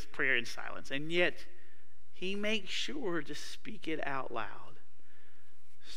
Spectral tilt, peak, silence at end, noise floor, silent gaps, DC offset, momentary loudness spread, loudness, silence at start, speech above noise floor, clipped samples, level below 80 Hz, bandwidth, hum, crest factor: -3.5 dB/octave; -16 dBFS; 0 s; -68 dBFS; none; 3%; 13 LU; -36 LUFS; 0 s; 31 dB; under 0.1%; -66 dBFS; 15.5 kHz; none; 24 dB